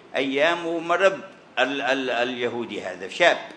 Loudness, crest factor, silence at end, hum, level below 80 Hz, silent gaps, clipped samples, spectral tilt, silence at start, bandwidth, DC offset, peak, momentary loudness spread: -23 LUFS; 22 dB; 0 s; none; -78 dBFS; none; under 0.1%; -3.5 dB/octave; 0.1 s; 10 kHz; under 0.1%; -2 dBFS; 12 LU